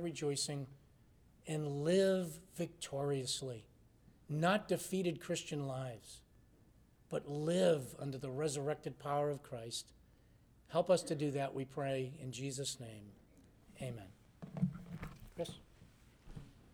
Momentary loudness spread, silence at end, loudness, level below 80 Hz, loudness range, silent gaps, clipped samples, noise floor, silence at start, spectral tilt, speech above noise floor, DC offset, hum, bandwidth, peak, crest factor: 19 LU; 0.15 s; -39 LUFS; -66 dBFS; 7 LU; none; under 0.1%; -66 dBFS; 0 s; -5 dB/octave; 28 dB; under 0.1%; none; over 20 kHz; -20 dBFS; 20 dB